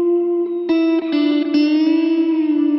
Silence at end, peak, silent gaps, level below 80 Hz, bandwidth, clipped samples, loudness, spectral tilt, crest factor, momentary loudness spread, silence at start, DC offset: 0 s; -6 dBFS; none; -68 dBFS; 6 kHz; under 0.1%; -17 LUFS; -6 dB/octave; 10 dB; 3 LU; 0 s; under 0.1%